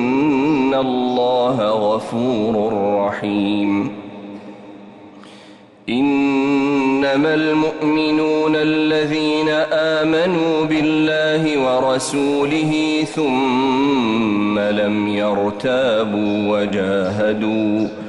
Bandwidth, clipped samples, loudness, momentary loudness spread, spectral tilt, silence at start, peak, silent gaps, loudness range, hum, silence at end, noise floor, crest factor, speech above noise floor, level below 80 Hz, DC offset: 11.5 kHz; under 0.1%; -17 LUFS; 3 LU; -5.5 dB/octave; 0 s; -8 dBFS; none; 5 LU; none; 0 s; -43 dBFS; 10 dB; 26 dB; -54 dBFS; under 0.1%